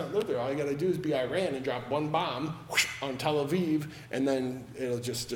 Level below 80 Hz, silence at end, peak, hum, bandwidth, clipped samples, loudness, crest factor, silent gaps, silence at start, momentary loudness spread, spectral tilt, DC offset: -64 dBFS; 0 s; -12 dBFS; none; 18 kHz; under 0.1%; -31 LUFS; 20 dB; none; 0 s; 6 LU; -4.5 dB/octave; under 0.1%